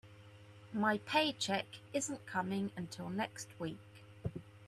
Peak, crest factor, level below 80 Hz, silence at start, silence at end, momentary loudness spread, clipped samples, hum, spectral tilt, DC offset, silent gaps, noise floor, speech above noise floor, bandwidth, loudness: -20 dBFS; 20 dB; -68 dBFS; 0.05 s; 0 s; 24 LU; under 0.1%; none; -4 dB/octave; under 0.1%; none; -57 dBFS; 19 dB; 14 kHz; -38 LUFS